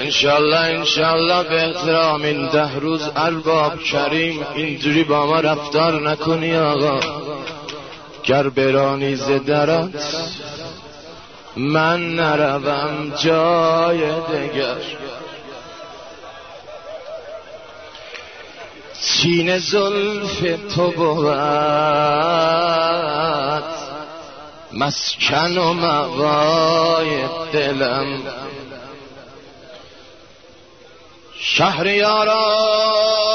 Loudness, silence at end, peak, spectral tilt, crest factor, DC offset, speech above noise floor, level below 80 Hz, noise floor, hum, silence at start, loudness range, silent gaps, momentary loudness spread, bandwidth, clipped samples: -17 LUFS; 0 s; -2 dBFS; -4.5 dB/octave; 16 dB; 0.2%; 28 dB; -54 dBFS; -45 dBFS; none; 0 s; 9 LU; none; 20 LU; 6.6 kHz; under 0.1%